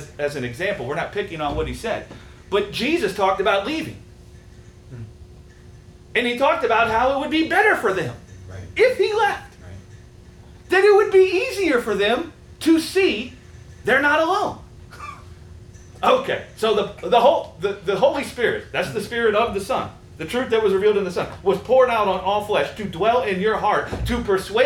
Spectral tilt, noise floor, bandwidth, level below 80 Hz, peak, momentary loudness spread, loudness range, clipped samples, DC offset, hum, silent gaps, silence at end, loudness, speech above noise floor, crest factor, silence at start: -5 dB/octave; -44 dBFS; 17.5 kHz; -44 dBFS; -4 dBFS; 14 LU; 5 LU; under 0.1%; under 0.1%; none; none; 0 s; -20 LUFS; 24 dB; 18 dB; 0 s